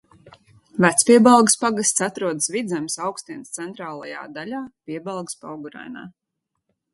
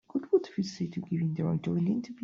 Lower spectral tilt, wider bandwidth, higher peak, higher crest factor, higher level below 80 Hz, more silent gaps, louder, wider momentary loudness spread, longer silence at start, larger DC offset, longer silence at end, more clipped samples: second, -3.5 dB/octave vs -8 dB/octave; first, 12 kHz vs 7.4 kHz; first, 0 dBFS vs -14 dBFS; about the same, 22 dB vs 18 dB; about the same, -66 dBFS vs -68 dBFS; neither; first, -19 LUFS vs -31 LUFS; first, 22 LU vs 6 LU; about the same, 0.25 s vs 0.15 s; neither; first, 0.85 s vs 0 s; neither